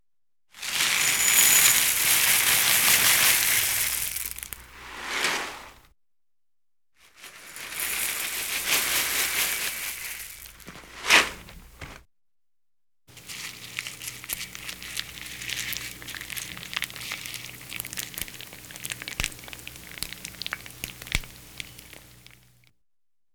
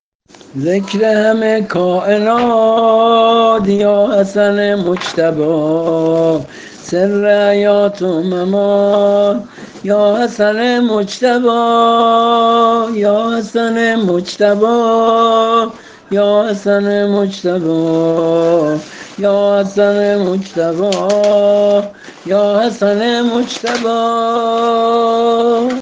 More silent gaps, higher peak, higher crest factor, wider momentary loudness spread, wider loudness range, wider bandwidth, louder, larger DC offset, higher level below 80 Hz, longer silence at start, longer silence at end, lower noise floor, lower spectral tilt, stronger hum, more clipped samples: neither; second, -4 dBFS vs 0 dBFS; first, 24 dB vs 12 dB; first, 22 LU vs 6 LU; first, 17 LU vs 2 LU; first, over 20 kHz vs 9.4 kHz; second, -23 LUFS vs -12 LUFS; neither; about the same, -50 dBFS vs -54 dBFS; about the same, 0.55 s vs 0.55 s; first, 1.35 s vs 0 s; first, under -90 dBFS vs -42 dBFS; second, 1 dB/octave vs -5.5 dB/octave; neither; neither